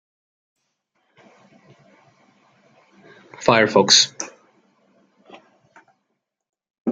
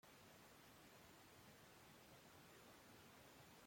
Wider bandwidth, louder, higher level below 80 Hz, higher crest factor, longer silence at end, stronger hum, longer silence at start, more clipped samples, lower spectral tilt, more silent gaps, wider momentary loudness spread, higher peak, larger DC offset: second, 11.5 kHz vs 16.5 kHz; first, -15 LUFS vs -65 LUFS; first, -66 dBFS vs -84 dBFS; first, 24 dB vs 12 dB; about the same, 0 s vs 0 s; neither; first, 3.4 s vs 0.05 s; neither; second, -2 dB/octave vs -3.5 dB/octave; first, 6.70-6.74 s, 6.80-6.85 s vs none; first, 20 LU vs 1 LU; first, 0 dBFS vs -54 dBFS; neither